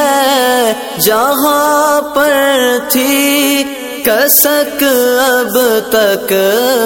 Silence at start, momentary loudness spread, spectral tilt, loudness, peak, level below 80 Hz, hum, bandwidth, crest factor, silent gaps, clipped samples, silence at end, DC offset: 0 s; 5 LU; -2 dB/octave; -10 LUFS; 0 dBFS; -50 dBFS; none; 17 kHz; 10 dB; none; under 0.1%; 0 s; under 0.1%